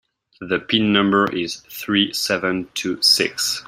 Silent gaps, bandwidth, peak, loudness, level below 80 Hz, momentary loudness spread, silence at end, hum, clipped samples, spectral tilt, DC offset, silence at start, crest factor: none; 16 kHz; -2 dBFS; -18 LUFS; -58 dBFS; 11 LU; 0.05 s; none; under 0.1%; -3 dB/octave; under 0.1%; 0.4 s; 18 dB